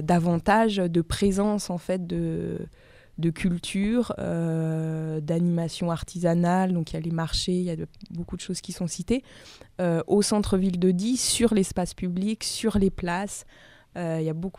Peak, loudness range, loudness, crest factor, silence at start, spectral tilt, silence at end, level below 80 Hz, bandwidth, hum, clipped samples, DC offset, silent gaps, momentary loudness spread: -8 dBFS; 4 LU; -26 LUFS; 18 dB; 0 s; -5.5 dB/octave; 0 s; -44 dBFS; 15 kHz; none; under 0.1%; under 0.1%; none; 11 LU